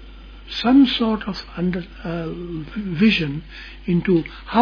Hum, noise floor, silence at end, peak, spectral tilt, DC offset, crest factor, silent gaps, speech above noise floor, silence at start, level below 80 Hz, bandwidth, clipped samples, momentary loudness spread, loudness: none; -39 dBFS; 0 s; -4 dBFS; -7.5 dB/octave; under 0.1%; 18 dB; none; 19 dB; 0 s; -40 dBFS; 5.4 kHz; under 0.1%; 16 LU; -21 LUFS